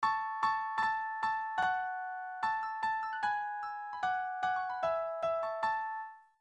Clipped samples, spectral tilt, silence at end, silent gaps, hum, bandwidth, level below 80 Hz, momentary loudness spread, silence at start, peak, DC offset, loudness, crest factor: under 0.1%; -3 dB/octave; 0.2 s; none; none; 9 kHz; -74 dBFS; 7 LU; 0 s; -18 dBFS; under 0.1%; -35 LUFS; 16 dB